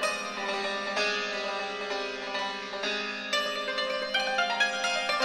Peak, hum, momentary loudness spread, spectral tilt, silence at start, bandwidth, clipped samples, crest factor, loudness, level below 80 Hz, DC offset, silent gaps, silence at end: -12 dBFS; none; 6 LU; -1 dB/octave; 0 s; 15 kHz; under 0.1%; 18 dB; -29 LUFS; -72 dBFS; under 0.1%; none; 0 s